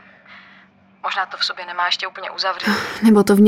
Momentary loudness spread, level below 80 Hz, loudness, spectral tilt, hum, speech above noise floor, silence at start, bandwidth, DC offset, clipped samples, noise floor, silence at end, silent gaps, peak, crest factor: 10 LU; -60 dBFS; -19 LUFS; -5 dB/octave; none; 33 dB; 0.3 s; 16 kHz; under 0.1%; under 0.1%; -50 dBFS; 0 s; none; -2 dBFS; 16 dB